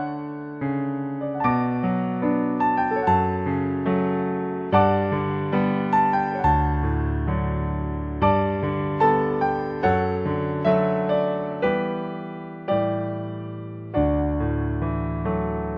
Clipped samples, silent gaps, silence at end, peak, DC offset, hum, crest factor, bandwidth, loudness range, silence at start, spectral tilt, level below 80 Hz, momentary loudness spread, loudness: under 0.1%; none; 0 s; -4 dBFS; under 0.1%; none; 18 dB; 5.6 kHz; 4 LU; 0 s; -10 dB/octave; -36 dBFS; 8 LU; -23 LUFS